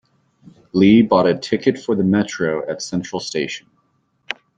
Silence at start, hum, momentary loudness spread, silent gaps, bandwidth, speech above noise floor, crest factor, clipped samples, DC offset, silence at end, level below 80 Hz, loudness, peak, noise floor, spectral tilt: 0.75 s; none; 13 LU; none; 9 kHz; 47 dB; 16 dB; under 0.1%; under 0.1%; 0.25 s; -56 dBFS; -18 LUFS; -2 dBFS; -64 dBFS; -6 dB/octave